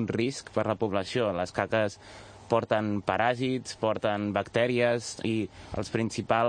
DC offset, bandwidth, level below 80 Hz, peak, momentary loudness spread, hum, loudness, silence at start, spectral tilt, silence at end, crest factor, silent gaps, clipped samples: under 0.1%; 9.8 kHz; -60 dBFS; -8 dBFS; 6 LU; none; -29 LUFS; 0 s; -5.5 dB/octave; 0 s; 20 dB; none; under 0.1%